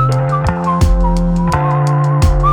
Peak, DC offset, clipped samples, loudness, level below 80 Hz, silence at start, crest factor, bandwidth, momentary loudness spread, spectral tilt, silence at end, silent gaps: 0 dBFS; under 0.1%; under 0.1%; -14 LUFS; -18 dBFS; 0 s; 12 dB; 12.5 kHz; 3 LU; -7.5 dB/octave; 0 s; none